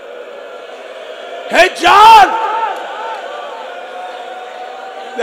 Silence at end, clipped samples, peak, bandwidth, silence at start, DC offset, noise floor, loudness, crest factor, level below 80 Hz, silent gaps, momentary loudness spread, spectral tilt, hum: 0 s; 2%; 0 dBFS; over 20 kHz; 0 s; under 0.1%; -30 dBFS; -8 LUFS; 14 dB; -48 dBFS; none; 25 LU; -1.5 dB/octave; none